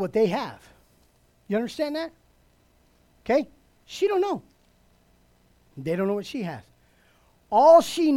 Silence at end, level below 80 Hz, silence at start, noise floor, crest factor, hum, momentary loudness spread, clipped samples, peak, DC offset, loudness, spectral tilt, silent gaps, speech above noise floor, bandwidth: 0 s; -62 dBFS; 0 s; -62 dBFS; 20 dB; none; 21 LU; under 0.1%; -6 dBFS; under 0.1%; -23 LUFS; -5.5 dB/octave; none; 39 dB; 15.5 kHz